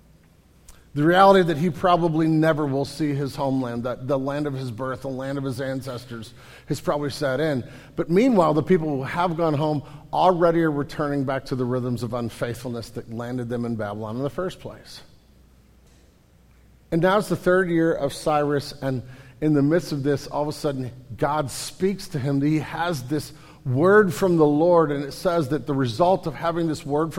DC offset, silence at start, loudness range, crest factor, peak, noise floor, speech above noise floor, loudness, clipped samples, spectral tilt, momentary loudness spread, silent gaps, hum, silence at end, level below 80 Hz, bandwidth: under 0.1%; 0.7 s; 9 LU; 20 dB; -2 dBFS; -55 dBFS; 32 dB; -23 LUFS; under 0.1%; -6.5 dB/octave; 13 LU; none; none; 0 s; -50 dBFS; 16.5 kHz